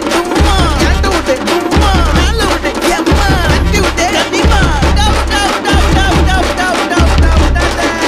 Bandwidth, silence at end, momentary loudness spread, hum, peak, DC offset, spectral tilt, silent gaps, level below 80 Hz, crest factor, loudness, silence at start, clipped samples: 15 kHz; 0 s; 3 LU; none; 0 dBFS; under 0.1%; -4.5 dB/octave; none; -14 dBFS; 10 dB; -11 LUFS; 0 s; under 0.1%